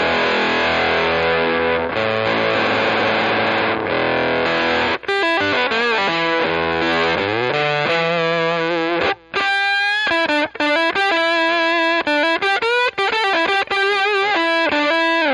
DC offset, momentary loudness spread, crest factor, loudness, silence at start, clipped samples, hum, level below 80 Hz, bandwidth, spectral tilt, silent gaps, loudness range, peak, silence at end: under 0.1%; 3 LU; 14 dB; -17 LUFS; 0 s; under 0.1%; none; -50 dBFS; 11 kHz; -4.5 dB/octave; none; 1 LU; -4 dBFS; 0 s